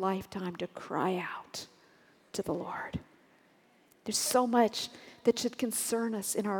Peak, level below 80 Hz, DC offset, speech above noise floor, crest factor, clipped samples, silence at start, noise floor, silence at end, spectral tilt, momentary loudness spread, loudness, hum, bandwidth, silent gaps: -12 dBFS; -66 dBFS; under 0.1%; 33 dB; 20 dB; under 0.1%; 0 s; -65 dBFS; 0 s; -3.5 dB/octave; 14 LU; -33 LUFS; none; 19 kHz; none